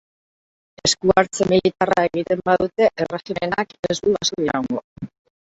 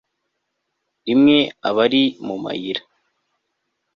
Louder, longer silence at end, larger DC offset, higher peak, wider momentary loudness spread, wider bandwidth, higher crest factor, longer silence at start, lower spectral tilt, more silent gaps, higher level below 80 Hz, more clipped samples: about the same, -20 LUFS vs -18 LUFS; second, 0.5 s vs 1.15 s; neither; about the same, -2 dBFS vs -2 dBFS; second, 10 LU vs 14 LU; first, 8.2 kHz vs 6.4 kHz; about the same, 20 dB vs 18 dB; second, 0.85 s vs 1.05 s; second, -4 dB/octave vs -6.5 dB/octave; first, 3.79-3.83 s, 4.84-4.96 s vs none; first, -52 dBFS vs -62 dBFS; neither